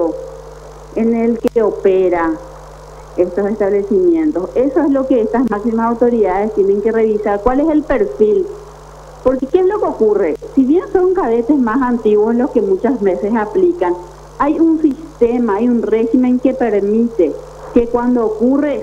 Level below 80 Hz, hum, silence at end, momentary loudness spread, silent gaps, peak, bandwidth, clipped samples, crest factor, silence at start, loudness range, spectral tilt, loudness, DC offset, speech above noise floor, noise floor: -38 dBFS; none; 0 s; 6 LU; none; 0 dBFS; 9.2 kHz; under 0.1%; 14 dB; 0 s; 2 LU; -8 dB/octave; -14 LUFS; under 0.1%; 22 dB; -35 dBFS